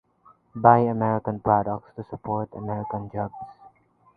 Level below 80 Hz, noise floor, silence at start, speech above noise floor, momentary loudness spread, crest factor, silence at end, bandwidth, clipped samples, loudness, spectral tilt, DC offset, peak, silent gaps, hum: -56 dBFS; -58 dBFS; 0.55 s; 34 dB; 20 LU; 24 dB; 0.5 s; 4.7 kHz; under 0.1%; -24 LUFS; -12 dB/octave; under 0.1%; -2 dBFS; none; none